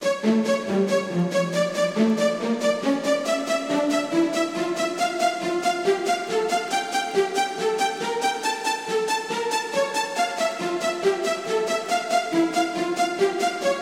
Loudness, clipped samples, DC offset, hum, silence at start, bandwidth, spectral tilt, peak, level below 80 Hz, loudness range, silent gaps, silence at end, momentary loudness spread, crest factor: -23 LUFS; under 0.1%; under 0.1%; none; 0 s; 16 kHz; -4 dB/octave; -8 dBFS; -72 dBFS; 2 LU; none; 0 s; 3 LU; 14 dB